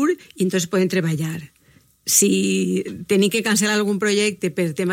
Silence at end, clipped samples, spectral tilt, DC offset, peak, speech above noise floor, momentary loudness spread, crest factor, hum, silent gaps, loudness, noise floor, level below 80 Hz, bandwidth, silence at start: 0 s; under 0.1%; -4 dB/octave; under 0.1%; -2 dBFS; 35 dB; 9 LU; 18 dB; none; none; -19 LUFS; -54 dBFS; -62 dBFS; 16.5 kHz; 0 s